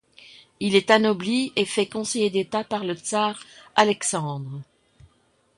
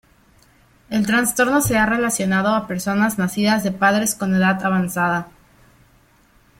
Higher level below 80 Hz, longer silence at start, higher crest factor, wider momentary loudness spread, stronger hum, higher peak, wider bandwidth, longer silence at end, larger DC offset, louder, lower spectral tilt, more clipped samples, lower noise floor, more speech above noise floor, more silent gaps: second, -66 dBFS vs -48 dBFS; second, 0.6 s vs 0.9 s; first, 22 dB vs 16 dB; first, 12 LU vs 5 LU; neither; about the same, -2 dBFS vs -4 dBFS; second, 11.5 kHz vs 16.5 kHz; second, 0.95 s vs 1.3 s; neither; second, -23 LUFS vs -19 LUFS; about the same, -3.5 dB/octave vs -4.5 dB/octave; neither; first, -64 dBFS vs -55 dBFS; first, 41 dB vs 37 dB; neither